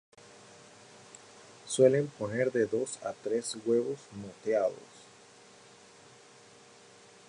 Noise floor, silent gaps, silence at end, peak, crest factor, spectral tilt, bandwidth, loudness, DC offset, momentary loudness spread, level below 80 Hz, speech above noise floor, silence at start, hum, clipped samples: -56 dBFS; none; 2.3 s; -10 dBFS; 22 dB; -5 dB/octave; 11.5 kHz; -31 LUFS; under 0.1%; 28 LU; -74 dBFS; 26 dB; 1.15 s; none; under 0.1%